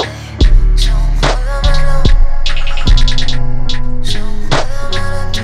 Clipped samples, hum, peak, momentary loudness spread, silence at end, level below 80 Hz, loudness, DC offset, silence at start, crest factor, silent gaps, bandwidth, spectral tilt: under 0.1%; none; 0 dBFS; 7 LU; 0 s; -10 dBFS; -16 LUFS; under 0.1%; 0 s; 8 dB; none; 10 kHz; -4.5 dB/octave